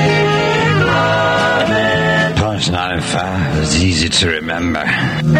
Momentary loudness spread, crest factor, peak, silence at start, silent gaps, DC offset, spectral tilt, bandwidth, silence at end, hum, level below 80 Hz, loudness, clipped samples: 5 LU; 14 dB; 0 dBFS; 0 s; none; under 0.1%; -4.5 dB/octave; 11.5 kHz; 0 s; none; -34 dBFS; -14 LUFS; under 0.1%